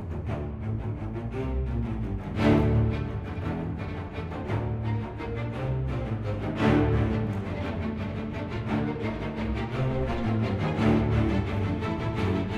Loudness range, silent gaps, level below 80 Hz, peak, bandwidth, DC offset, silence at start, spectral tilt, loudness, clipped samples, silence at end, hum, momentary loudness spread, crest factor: 3 LU; none; -38 dBFS; -8 dBFS; 8 kHz; under 0.1%; 0 s; -8.5 dB/octave; -29 LUFS; under 0.1%; 0 s; none; 10 LU; 18 dB